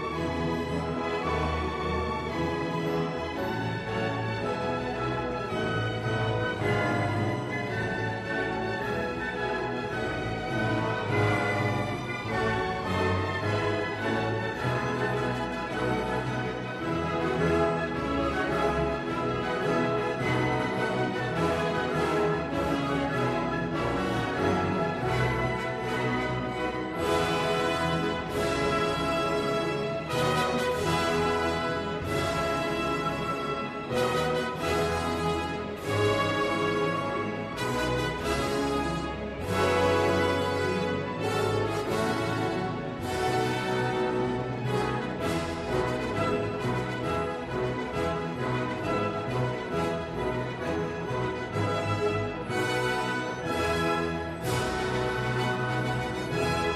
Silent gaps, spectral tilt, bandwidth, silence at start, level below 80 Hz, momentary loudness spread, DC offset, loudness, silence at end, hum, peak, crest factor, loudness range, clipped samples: none; -5.5 dB/octave; 13.5 kHz; 0 s; -46 dBFS; 5 LU; under 0.1%; -29 LUFS; 0 s; none; -12 dBFS; 16 dB; 3 LU; under 0.1%